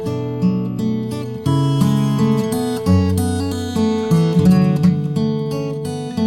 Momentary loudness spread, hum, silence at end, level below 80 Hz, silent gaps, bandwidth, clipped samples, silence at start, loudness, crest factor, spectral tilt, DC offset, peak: 9 LU; none; 0 s; -44 dBFS; none; 16.5 kHz; under 0.1%; 0 s; -18 LUFS; 14 dB; -7.5 dB/octave; under 0.1%; -2 dBFS